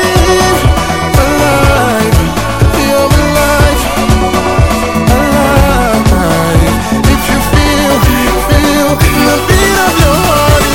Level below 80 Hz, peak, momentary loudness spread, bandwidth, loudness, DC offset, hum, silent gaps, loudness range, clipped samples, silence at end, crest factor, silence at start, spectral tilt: -14 dBFS; 0 dBFS; 3 LU; 17.5 kHz; -9 LUFS; 3%; none; none; 1 LU; 0.2%; 0 s; 8 dB; 0 s; -5 dB/octave